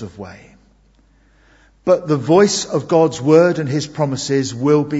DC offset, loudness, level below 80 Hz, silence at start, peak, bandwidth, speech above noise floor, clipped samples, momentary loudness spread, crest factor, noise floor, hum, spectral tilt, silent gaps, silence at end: under 0.1%; -16 LUFS; -54 dBFS; 0 s; 0 dBFS; 8 kHz; 38 dB; under 0.1%; 12 LU; 16 dB; -53 dBFS; none; -5.5 dB/octave; none; 0 s